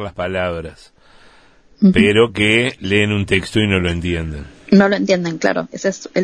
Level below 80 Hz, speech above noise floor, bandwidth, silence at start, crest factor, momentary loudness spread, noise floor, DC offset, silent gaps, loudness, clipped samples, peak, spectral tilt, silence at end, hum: -38 dBFS; 33 dB; 10.5 kHz; 0 s; 16 dB; 11 LU; -49 dBFS; 0.1%; none; -16 LUFS; under 0.1%; 0 dBFS; -5.5 dB/octave; 0 s; none